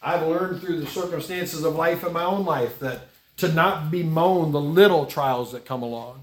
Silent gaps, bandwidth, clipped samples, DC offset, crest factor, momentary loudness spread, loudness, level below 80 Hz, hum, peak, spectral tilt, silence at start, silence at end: none; 18 kHz; under 0.1%; under 0.1%; 20 dB; 13 LU; -23 LUFS; -60 dBFS; none; -4 dBFS; -6 dB/octave; 0 s; 0 s